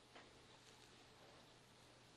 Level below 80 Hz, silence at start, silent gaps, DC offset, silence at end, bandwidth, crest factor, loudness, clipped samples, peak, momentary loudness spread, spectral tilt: -82 dBFS; 0 s; none; under 0.1%; 0 s; 12 kHz; 18 dB; -65 LUFS; under 0.1%; -48 dBFS; 3 LU; -3 dB/octave